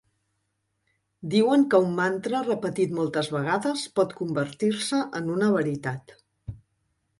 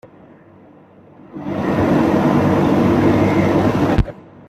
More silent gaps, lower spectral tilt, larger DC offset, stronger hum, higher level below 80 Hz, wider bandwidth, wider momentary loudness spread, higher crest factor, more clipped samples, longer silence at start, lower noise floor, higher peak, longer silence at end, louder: neither; second, -5.5 dB/octave vs -8 dB/octave; neither; neither; second, -60 dBFS vs -34 dBFS; second, 11.5 kHz vs 13 kHz; first, 16 LU vs 11 LU; first, 20 dB vs 14 dB; neither; second, 1.2 s vs 1.35 s; first, -76 dBFS vs -45 dBFS; about the same, -6 dBFS vs -4 dBFS; first, 0.65 s vs 0.25 s; second, -25 LUFS vs -16 LUFS